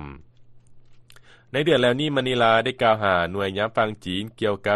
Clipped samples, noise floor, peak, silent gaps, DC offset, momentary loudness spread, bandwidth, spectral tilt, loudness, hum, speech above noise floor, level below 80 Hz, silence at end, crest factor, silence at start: under 0.1%; -49 dBFS; -4 dBFS; none; under 0.1%; 10 LU; 12.5 kHz; -5.5 dB/octave; -22 LUFS; none; 28 dB; -54 dBFS; 0 s; 18 dB; 0 s